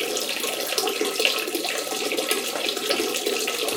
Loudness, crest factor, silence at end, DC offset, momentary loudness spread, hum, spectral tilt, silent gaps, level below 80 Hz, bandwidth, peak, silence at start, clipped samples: -24 LUFS; 22 dB; 0 s; under 0.1%; 4 LU; none; 0 dB/octave; none; -76 dBFS; 19 kHz; -4 dBFS; 0 s; under 0.1%